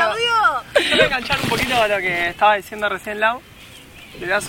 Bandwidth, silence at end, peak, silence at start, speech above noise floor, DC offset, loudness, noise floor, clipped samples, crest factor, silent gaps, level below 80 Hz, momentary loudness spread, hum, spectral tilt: 17 kHz; 0 s; -2 dBFS; 0 s; 21 dB; under 0.1%; -18 LUFS; -41 dBFS; under 0.1%; 18 dB; none; -44 dBFS; 8 LU; none; -3 dB/octave